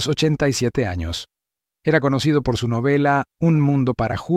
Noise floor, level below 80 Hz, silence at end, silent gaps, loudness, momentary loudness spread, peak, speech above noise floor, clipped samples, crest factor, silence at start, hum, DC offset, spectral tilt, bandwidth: -75 dBFS; -42 dBFS; 0 s; none; -20 LUFS; 8 LU; -4 dBFS; 56 dB; under 0.1%; 14 dB; 0 s; none; under 0.1%; -6 dB/octave; 14.5 kHz